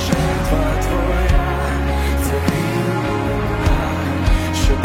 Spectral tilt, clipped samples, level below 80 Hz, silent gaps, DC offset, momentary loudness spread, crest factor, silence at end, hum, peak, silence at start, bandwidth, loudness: -6 dB/octave; under 0.1%; -20 dBFS; none; under 0.1%; 2 LU; 14 dB; 0 s; none; -2 dBFS; 0 s; 16.5 kHz; -19 LUFS